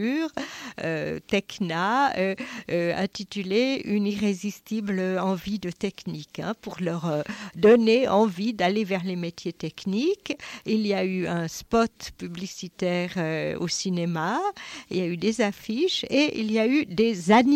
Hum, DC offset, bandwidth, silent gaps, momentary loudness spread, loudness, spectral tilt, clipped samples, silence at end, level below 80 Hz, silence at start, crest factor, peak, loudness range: none; under 0.1%; 15.5 kHz; none; 11 LU; -26 LUFS; -5.5 dB/octave; under 0.1%; 0 s; -58 dBFS; 0 s; 16 dB; -8 dBFS; 5 LU